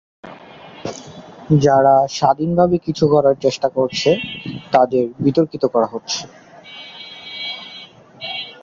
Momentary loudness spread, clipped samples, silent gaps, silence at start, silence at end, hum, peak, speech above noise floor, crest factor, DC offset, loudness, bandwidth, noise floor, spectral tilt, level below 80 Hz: 21 LU; under 0.1%; none; 0.25 s; 0.1 s; none; 0 dBFS; 24 dB; 18 dB; under 0.1%; -17 LUFS; 7.6 kHz; -40 dBFS; -6 dB/octave; -52 dBFS